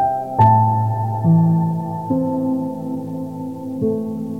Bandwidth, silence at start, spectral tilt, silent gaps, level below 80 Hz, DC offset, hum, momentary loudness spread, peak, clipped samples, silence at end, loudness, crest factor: 3.9 kHz; 0 s; -10.5 dB/octave; none; -52 dBFS; 0.3%; none; 13 LU; -4 dBFS; under 0.1%; 0 s; -19 LUFS; 14 dB